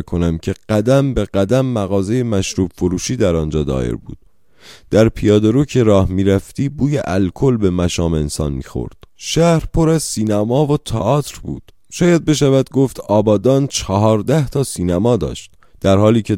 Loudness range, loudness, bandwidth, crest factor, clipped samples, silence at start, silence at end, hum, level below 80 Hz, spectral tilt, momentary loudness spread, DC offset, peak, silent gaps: 3 LU; -16 LUFS; 16.5 kHz; 16 dB; under 0.1%; 0 s; 0 s; none; -34 dBFS; -6.5 dB/octave; 9 LU; 0.4%; 0 dBFS; none